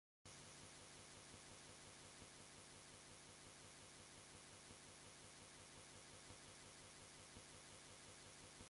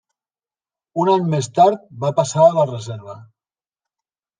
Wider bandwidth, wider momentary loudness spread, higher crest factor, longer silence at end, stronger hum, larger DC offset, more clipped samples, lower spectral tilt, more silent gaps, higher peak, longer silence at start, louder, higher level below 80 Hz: first, 11.5 kHz vs 10 kHz; second, 1 LU vs 17 LU; about the same, 18 dB vs 18 dB; second, 0 s vs 1.15 s; neither; neither; neither; second, -2 dB/octave vs -6.5 dB/octave; neither; second, -46 dBFS vs -2 dBFS; second, 0.25 s vs 0.95 s; second, -60 LUFS vs -17 LUFS; second, -78 dBFS vs -66 dBFS